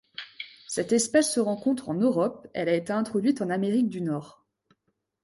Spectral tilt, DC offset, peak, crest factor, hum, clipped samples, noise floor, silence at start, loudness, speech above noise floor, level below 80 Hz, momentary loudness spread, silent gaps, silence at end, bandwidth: -4.5 dB/octave; under 0.1%; -10 dBFS; 18 dB; none; under 0.1%; -77 dBFS; 0.2 s; -26 LUFS; 51 dB; -70 dBFS; 12 LU; none; 0.95 s; 12 kHz